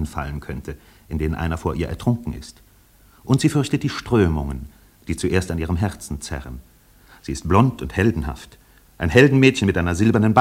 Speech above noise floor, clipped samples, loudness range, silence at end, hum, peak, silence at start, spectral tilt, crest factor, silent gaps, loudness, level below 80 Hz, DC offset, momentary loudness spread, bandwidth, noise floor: 32 dB; under 0.1%; 7 LU; 0 s; none; 0 dBFS; 0 s; -6.5 dB/octave; 20 dB; none; -20 LUFS; -38 dBFS; under 0.1%; 20 LU; 16 kHz; -52 dBFS